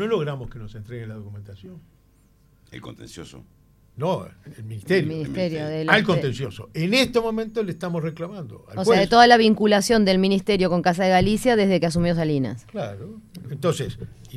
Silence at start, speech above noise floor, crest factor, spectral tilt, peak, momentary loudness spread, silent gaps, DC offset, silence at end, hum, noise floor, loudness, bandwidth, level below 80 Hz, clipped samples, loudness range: 0 s; 35 dB; 20 dB; -5.5 dB/octave; -2 dBFS; 22 LU; none; under 0.1%; 0 s; none; -57 dBFS; -21 LUFS; 14 kHz; -46 dBFS; under 0.1%; 17 LU